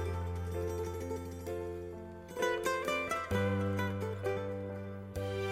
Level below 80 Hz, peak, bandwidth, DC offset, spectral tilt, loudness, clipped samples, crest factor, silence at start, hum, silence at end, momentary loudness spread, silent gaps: -58 dBFS; -20 dBFS; 16 kHz; under 0.1%; -6 dB/octave; -37 LUFS; under 0.1%; 18 dB; 0 s; none; 0 s; 10 LU; none